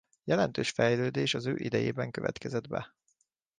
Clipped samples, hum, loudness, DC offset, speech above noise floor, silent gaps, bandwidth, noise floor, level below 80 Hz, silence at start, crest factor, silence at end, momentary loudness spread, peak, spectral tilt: under 0.1%; none; -31 LUFS; under 0.1%; 45 dB; none; 9.8 kHz; -75 dBFS; -64 dBFS; 0.25 s; 18 dB; 0.7 s; 9 LU; -12 dBFS; -5.5 dB/octave